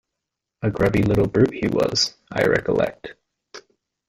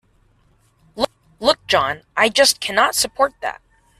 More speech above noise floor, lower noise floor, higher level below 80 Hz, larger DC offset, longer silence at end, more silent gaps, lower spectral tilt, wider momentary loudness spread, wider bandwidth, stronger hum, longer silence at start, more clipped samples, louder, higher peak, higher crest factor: first, 63 dB vs 40 dB; first, -83 dBFS vs -58 dBFS; first, -44 dBFS vs -52 dBFS; neither; about the same, 0.5 s vs 0.45 s; neither; first, -5.5 dB/octave vs -1 dB/octave; second, 8 LU vs 11 LU; first, 16 kHz vs 14 kHz; neither; second, 0.6 s vs 0.95 s; neither; second, -21 LUFS vs -18 LUFS; about the same, -2 dBFS vs 0 dBFS; about the same, 20 dB vs 20 dB